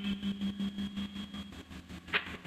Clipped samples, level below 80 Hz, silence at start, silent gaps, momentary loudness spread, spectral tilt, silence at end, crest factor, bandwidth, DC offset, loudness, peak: under 0.1%; -58 dBFS; 0 s; none; 13 LU; -5.5 dB/octave; 0 s; 22 dB; 14 kHz; under 0.1%; -38 LUFS; -16 dBFS